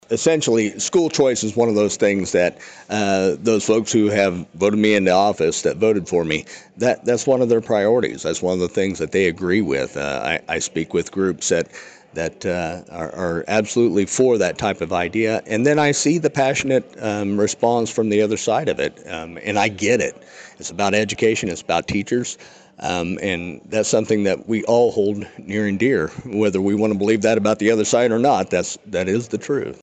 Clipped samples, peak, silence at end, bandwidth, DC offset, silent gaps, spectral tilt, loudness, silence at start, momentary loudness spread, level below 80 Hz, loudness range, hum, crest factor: under 0.1%; -4 dBFS; 0.1 s; 9.2 kHz; under 0.1%; none; -4.5 dB/octave; -19 LUFS; 0.1 s; 8 LU; -54 dBFS; 4 LU; none; 14 dB